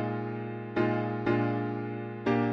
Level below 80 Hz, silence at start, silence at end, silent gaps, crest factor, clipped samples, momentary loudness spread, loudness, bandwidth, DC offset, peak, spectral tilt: -62 dBFS; 0 s; 0 s; none; 16 dB; under 0.1%; 7 LU; -31 LUFS; 6.2 kHz; under 0.1%; -14 dBFS; -9 dB/octave